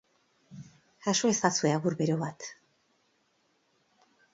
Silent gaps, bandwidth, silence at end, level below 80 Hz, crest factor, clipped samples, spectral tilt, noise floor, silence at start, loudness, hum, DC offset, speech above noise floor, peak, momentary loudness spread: none; 8 kHz; 1.8 s; -74 dBFS; 24 dB; under 0.1%; -4 dB/octave; -72 dBFS; 0.5 s; -28 LUFS; none; under 0.1%; 44 dB; -8 dBFS; 24 LU